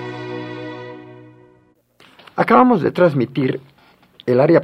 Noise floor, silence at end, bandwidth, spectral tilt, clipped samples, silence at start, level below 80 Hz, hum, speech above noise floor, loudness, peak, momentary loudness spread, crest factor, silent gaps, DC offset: -55 dBFS; 0 s; 11.5 kHz; -8.5 dB/octave; under 0.1%; 0 s; -62 dBFS; none; 41 dB; -17 LUFS; 0 dBFS; 19 LU; 18 dB; none; under 0.1%